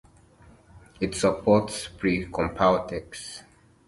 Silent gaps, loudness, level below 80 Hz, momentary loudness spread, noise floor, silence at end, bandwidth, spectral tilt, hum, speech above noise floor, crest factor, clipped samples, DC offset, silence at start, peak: none; -25 LUFS; -48 dBFS; 16 LU; -54 dBFS; 0.45 s; 11.5 kHz; -5 dB/octave; none; 29 dB; 20 dB; under 0.1%; under 0.1%; 0.75 s; -6 dBFS